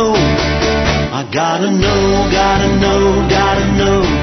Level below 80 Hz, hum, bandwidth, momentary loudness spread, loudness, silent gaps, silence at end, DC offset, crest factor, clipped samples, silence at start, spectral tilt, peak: -22 dBFS; none; 6.4 kHz; 3 LU; -13 LUFS; none; 0 s; under 0.1%; 12 dB; under 0.1%; 0 s; -5 dB/octave; 0 dBFS